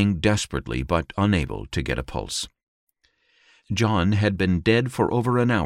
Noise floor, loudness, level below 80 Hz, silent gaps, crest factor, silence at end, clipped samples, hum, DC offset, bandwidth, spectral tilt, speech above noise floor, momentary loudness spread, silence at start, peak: -66 dBFS; -23 LUFS; -40 dBFS; 2.63-2.87 s; 18 dB; 0 s; under 0.1%; none; under 0.1%; 14 kHz; -5.5 dB/octave; 44 dB; 8 LU; 0 s; -6 dBFS